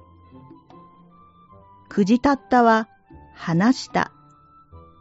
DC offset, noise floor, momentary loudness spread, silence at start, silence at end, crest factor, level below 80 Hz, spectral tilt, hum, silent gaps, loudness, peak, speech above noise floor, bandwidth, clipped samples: under 0.1%; -52 dBFS; 13 LU; 1.9 s; 0.2 s; 20 dB; -54 dBFS; -5 dB/octave; none; none; -20 LUFS; -4 dBFS; 34 dB; 8 kHz; under 0.1%